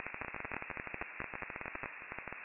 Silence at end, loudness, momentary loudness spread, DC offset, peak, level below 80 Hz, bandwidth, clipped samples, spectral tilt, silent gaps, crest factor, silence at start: 0 s; -43 LUFS; 3 LU; under 0.1%; -22 dBFS; -62 dBFS; 4.8 kHz; under 0.1%; -3.5 dB/octave; none; 24 dB; 0 s